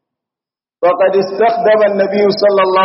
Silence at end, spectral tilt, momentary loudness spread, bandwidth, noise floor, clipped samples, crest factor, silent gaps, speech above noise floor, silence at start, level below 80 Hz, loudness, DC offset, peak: 0 s; -3 dB/octave; 3 LU; 6 kHz; -89 dBFS; under 0.1%; 12 dB; none; 78 dB; 0.8 s; -62 dBFS; -12 LUFS; under 0.1%; 0 dBFS